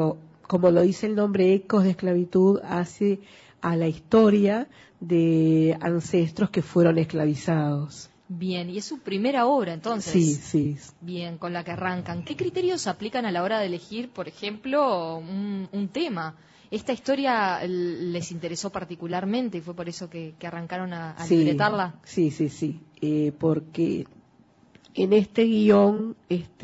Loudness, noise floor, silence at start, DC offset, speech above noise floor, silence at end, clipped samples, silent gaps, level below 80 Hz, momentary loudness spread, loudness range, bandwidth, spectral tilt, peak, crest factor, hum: -25 LUFS; -58 dBFS; 0 s; under 0.1%; 34 dB; 0 s; under 0.1%; none; -62 dBFS; 14 LU; 6 LU; 8 kHz; -6.5 dB/octave; -8 dBFS; 16 dB; none